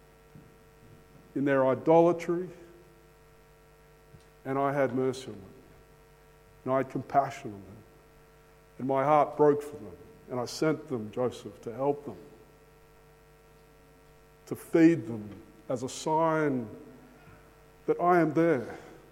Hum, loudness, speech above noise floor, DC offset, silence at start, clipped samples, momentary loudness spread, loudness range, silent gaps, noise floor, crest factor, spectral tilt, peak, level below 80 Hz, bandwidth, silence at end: none; -28 LUFS; 30 dB; under 0.1%; 1.35 s; under 0.1%; 21 LU; 6 LU; none; -57 dBFS; 20 dB; -6.5 dB/octave; -10 dBFS; -64 dBFS; 16 kHz; 0.15 s